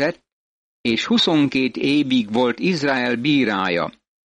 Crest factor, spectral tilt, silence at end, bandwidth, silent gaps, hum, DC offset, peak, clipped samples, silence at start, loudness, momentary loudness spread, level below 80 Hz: 12 dB; -5 dB/octave; 0.35 s; 9.6 kHz; 0.32-0.84 s; none; under 0.1%; -8 dBFS; under 0.1%; 0 s; -19 LUFS; 7 LU; -58 dBFS